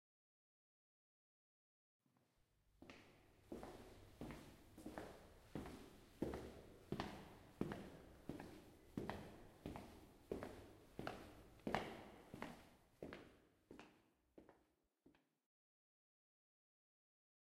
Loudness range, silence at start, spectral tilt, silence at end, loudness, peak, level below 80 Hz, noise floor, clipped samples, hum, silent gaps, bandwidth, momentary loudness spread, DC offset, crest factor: 11 LU; 2.65 s; -6 dB/octave; 2.3 s; -55 LUFS; -22 dBFS; -70 dBFS; -82 dBFS; under 0.1%; none; none; 16 kHz; 14 LU; under 0.1%; 34 dB